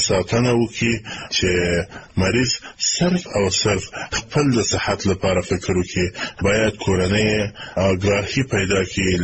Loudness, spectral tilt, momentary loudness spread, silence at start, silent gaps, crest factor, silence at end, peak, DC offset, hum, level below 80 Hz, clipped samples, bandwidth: -20 LUFS; -4.5 dB/octave; 5 LU; 0 s; none; 12 dB; 0 s; -6 dBFS; 0.2%; none; -40 dBFS; under 0.1%; 8.6 kHz